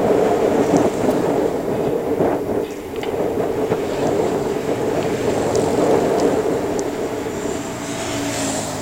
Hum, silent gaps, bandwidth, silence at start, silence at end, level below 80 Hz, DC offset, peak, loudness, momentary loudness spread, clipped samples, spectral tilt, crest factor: none; none; 16 kHz; 0 s; 0 s; -44 dBFS; under 0.1%; 0 dBFS; -20 LUFS; 8 LU; under 0.1%; -5.5 dB/octave; 20 dB